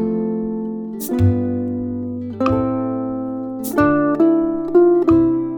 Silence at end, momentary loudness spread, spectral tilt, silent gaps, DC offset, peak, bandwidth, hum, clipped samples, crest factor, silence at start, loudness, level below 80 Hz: 0 s; 11 LU; -8 dB/octave; none; under 0.1%; -2 dBFS; over 20 kHz; none; under 0.1%; 16 dB; 0 s; -18 LUFS; -42 dBFS